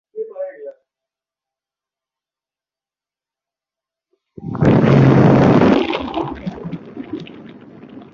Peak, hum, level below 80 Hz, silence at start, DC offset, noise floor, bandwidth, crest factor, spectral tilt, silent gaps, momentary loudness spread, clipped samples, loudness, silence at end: -2 dBFS; none; -42 dBFS; 0.15 s; under 0.1%; under -90 dBFS; 7 kHz; 18 dB; -9 dB/octave; none; 20 LU; under 0.1%; -13 LUFS; 0.1 s